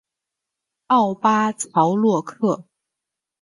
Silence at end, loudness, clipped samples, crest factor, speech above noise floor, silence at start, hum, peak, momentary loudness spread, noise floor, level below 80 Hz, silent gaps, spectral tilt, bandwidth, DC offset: 0.8 s; -20 LUFS; under 0.1%; 18 dB; 66 dB; 0.9 s; none; -4 dBFS; 6 LU; -85 dBFS; -68 dBFS; none; -5.5 dB/octave; 11.5 kHz; under 0.1%